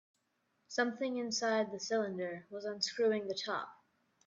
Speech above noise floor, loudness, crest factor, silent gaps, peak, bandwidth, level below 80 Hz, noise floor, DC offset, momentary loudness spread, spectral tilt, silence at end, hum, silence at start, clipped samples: 44 dB; -36 LUFS; 18 dB; none; -18 dBFS; 7.8 kHz; -86 dBFS; -80 dBFS; under 0.1%; 9 LU; -3 dB/octave; 0.5 s; none; 0.7 s; under 0.1%